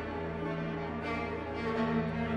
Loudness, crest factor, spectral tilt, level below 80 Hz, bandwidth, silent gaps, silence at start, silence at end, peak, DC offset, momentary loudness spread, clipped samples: -35 LUFS; 14 dB; -8 dB/octave; -50 dBFS; 8.6 kHz; none; 0 s; 0 s; -20 dBFS; under 0.1%; 5 LU; under 0.1%